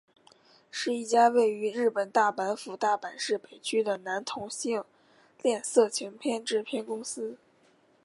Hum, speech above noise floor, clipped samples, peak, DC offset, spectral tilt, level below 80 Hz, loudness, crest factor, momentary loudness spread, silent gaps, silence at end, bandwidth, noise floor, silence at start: none; 36 dB; under 0.1%; -10 dBFS; under 0.1%; -2.5 dB/octave; -80 dBFS; -29 LUFS; 20 dB; 11 LU; none; 0.7 s; 11.5 kHz; -64 dBFS; 0.75 s